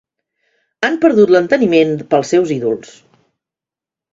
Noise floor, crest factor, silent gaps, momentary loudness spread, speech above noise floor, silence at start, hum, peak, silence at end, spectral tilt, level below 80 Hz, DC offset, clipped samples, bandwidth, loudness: -88 dBFS; 16 dB; none; 9 LU; 75 dB; 0.8 s; none; 0 dBFS; 1.3 s; -6 dB/octave; -60 dBFS; under 0.1%; under 0.1%; 7.8 kHz; -13 LUFS